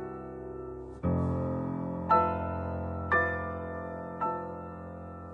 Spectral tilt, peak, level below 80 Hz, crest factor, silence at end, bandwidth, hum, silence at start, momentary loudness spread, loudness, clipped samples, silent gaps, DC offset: -9.5 dB/octave; -12 dBFS; -50 dBFS; 22 dB; 0 s; 4.7 kHz; none; 0 s; 15 LU; -32 LUFS; under 0.1%; none; under 0.1%